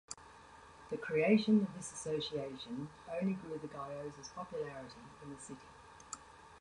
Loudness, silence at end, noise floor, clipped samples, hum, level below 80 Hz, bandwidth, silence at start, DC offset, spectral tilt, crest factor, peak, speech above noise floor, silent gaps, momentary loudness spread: -37 LUFS; 0 s; -58 dBFS; under 0.1%; none; -70 dBFS; 11 kHz; 0.1 s; under 0.1%; -5.5 dB/octave; 22 dB; -18 dBFS; 20 dB; none; 25 LU